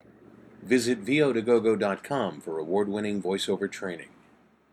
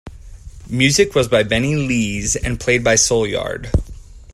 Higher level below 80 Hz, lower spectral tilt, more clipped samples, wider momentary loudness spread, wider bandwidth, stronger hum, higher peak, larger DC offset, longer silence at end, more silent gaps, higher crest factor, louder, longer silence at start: second, -68 dBFS vs -32 dBFS; first, -5 dB/octave vs -3.5 dB/octave; neither; about the same, 12 LU vs 10 LU; about the same, 13 kHz vs 14 kHz; neither; second, -10 dBFS vs 0 dBFS; neither; first, 0.65 s vs 0 s; neither; about the same, 18 dB vs 18 dB; second, -27 LUFS vs -17 LUFS; first, 0.6 s vs 0.05 s